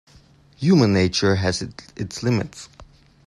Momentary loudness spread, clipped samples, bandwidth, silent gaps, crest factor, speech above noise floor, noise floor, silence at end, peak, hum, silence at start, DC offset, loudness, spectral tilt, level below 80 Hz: 17 LU; under 0.1%; 11.5 kHz; none; 18 dB; 32 dB; -52 dBFS; 0.45 s; -4 dBFS; none; 0.6 s; under 0.1%; -20 LUFS; -5.5 dB/octave; -52 dBFS